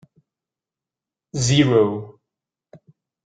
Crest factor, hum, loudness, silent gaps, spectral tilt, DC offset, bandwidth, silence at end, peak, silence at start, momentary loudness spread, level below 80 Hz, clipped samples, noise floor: 20 dB; none; -18 LUFS; none; -5.5 dB/octave; under 0.1%; 9.4 kHz; 0.5 s; -4 dBFS; 1.35 s; 17 LU; -54 dBFS; under 0.1%; -89 dBFS